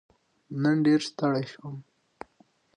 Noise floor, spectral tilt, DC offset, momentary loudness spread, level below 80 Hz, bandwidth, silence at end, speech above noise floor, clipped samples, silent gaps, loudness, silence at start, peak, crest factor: -64 dBFS; -6.5 dB/octave; under 0.1%; 25 LU; -74 dBFS; 10.5 kHz; 0.95 s; 38 dB; under 0.1%; none; -26 LUFS; 0.5 s; -14 dBFS; 16 dB